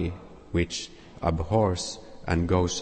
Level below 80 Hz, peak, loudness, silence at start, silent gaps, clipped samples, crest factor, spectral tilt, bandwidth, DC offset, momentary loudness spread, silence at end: -40 dBFS; -8 dBFS; -28 LUFS; 0 s; none; under 0.1%; 18 dB; -5.5 dB/octave; 8.8 kHz; under 0.1%; 13 LU; 0 s